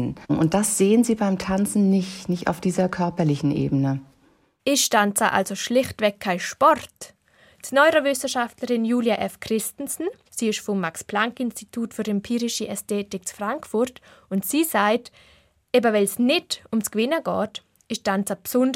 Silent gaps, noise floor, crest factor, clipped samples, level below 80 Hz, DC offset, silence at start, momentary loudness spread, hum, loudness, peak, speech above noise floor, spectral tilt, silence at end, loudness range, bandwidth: none; -61 dBFS; 18 dB; under 0.1%; -56 dBFS; under 0.1%; 0 s; 10 LU; none; -23 LUFS; -4 dBFS; 38 dB; -4.5 dB/octave; 0 s; 5 LU; 16.5 kHz